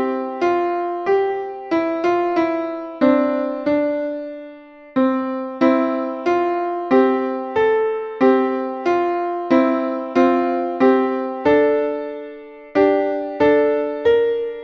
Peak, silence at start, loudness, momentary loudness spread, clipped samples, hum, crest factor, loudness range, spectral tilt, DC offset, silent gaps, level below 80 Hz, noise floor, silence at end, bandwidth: -2 dBFS; 0 s; -19 LUFS; 8 LU; under 0.1%; none; 16 dB; 3 LU; -6.5 dB/octave; under 0.1%; none; -58 dBFS; -40 dBFS; 0 s; 6.4 kHz